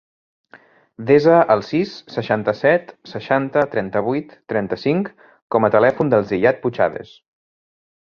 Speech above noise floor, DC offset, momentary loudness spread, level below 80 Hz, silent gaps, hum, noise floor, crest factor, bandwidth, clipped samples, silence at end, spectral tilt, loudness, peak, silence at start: 32 dB; under 0.1%; 11 LU; -58 dBFS; 5.42-5.50 s; none; -49 dBFS; 18 dB; 6.8 kHz; under 0.1%; 1.1 s; -8 dB/octave; -18 LUFS; -2 dBFS; 1 s